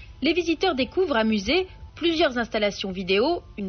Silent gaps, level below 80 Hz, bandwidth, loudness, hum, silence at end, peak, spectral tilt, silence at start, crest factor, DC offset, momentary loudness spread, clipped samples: none; -46 dBFS; 6.6 kHz; -24 LUFS; none; 0 s; -10 dBFS; -2.5 dB/octave; 0 s; 14 dB; under 0.1%; 4 LU; under 0.1%